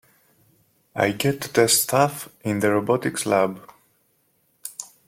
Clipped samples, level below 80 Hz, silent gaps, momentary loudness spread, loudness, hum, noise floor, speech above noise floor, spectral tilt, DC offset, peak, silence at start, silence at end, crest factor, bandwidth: under 0.1%; -64 dBFS; none; 18 LU; -21 LUFS; none; -66 dBFS; 45 dB; -3.5 dB/octave; under 0.1%; -4 dBFS; 0.95 s; 0.25 s; 20 dB; 16.5 kHz